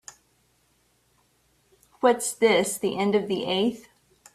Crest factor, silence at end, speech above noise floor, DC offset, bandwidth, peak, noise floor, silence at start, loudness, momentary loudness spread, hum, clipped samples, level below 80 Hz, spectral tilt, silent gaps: 20 dB; 0.55 s; 43 dB; under 0.1%; 15.5 kHz; -6 dBFS; -67 dBFS; 2 s; -24 LUFS; 6 LU; none; under 0.1%; -68 dBFS; -3.5 dB/octave; none